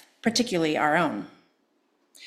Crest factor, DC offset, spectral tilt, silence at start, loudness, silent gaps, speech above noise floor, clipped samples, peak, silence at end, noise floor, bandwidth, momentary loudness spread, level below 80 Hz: 20 dB; under 0.1%; -4 dB/octave; 0.25 s; -24 LUFS; none; 45 dB; under 0.1%; -8 dBFS; 0 s; -70 dBFS; 14.5 kHz; 13 LU; -66 dBFS